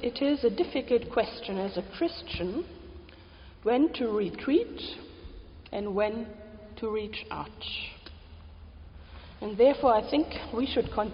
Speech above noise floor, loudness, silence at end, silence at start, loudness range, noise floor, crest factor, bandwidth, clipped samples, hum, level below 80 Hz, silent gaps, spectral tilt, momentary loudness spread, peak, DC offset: 22 dB; -29 LUFS; 0 s; 0 s; 6 LU; -50 dBFS; 20 dB; 5.4 kHz; under 0.1%; none; -50 dBFS; none; -4 dB/octave; 23 LU; -10 dBFS; under 0.1%